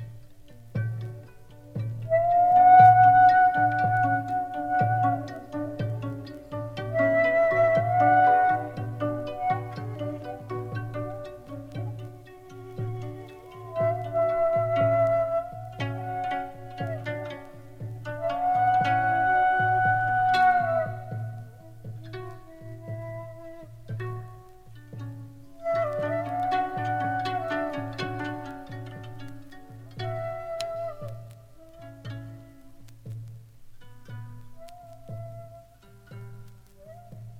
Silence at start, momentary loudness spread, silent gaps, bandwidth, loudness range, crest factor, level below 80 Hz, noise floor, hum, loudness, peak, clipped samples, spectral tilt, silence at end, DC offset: 0 s; 22 LU; none; 9.6 kHz; 24 LU; 22 dB; -56 dBFS; -52 dBFS; none; -24 LUFS; -6 dBFS; under 0.1%; -7 dB/octave; 0 s; under 0.1%